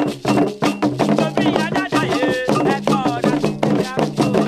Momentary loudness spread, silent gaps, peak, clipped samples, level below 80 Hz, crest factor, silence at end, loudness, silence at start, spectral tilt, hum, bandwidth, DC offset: 2 LU; none; 0 dBFS; under 0.1%; -50 dBFS; 16 dB; 0 s; -18 LUFS; 0 s; -6 dB/octave; none; 14.5 kHz; under 0.1%